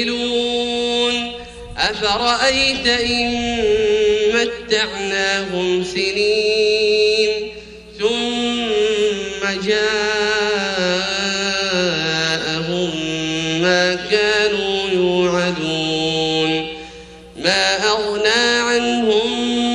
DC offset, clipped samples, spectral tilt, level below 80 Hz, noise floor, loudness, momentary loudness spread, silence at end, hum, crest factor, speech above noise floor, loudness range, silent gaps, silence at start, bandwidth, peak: under 0.1%; under 0.1%; -3 dB/octave; -44 dBFS; -38 dBFS; -17 LUFS; 6 LU; 0 s; none; 16 dB; 20 dB; 2 LU; none; 0 s; 11 kHz; -2 dBFS